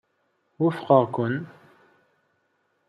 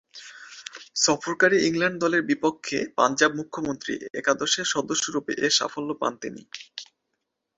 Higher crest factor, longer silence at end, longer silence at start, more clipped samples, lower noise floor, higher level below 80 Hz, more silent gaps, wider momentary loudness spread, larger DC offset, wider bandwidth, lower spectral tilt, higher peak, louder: about the same, 24 dB vs 22 dB; first, 1.45 s vs 0.75 s; first, 0.6 s vs 0.15 s; neither; second, -71 dBFS vs -80 dBFS; second, -74 dBFS vs -66 dBFS; neither; second, 12 LU vs 19 LU; neither; first, 10.5 kHz vs 8 kHz; first, -9 dB/octave vs -2.5 dB/octave; about the same, -4 dBFS vs -4 dBFS; about the same, -23 LUFS vs -24 LUFS